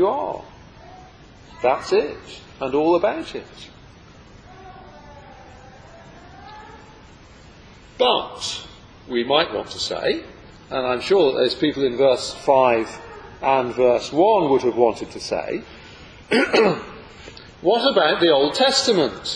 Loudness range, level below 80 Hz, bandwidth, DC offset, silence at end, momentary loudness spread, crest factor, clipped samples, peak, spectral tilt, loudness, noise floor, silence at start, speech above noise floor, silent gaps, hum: 8 LU; -52 dBFS; 10.5 kHz; under 0.1%; 0 s; 23 LU; 20 dB; under 0.1%; -2 dBFS; -4 dB/octave; -20 LUFS; -45 dBFS; 0 s; 26 dB; none; none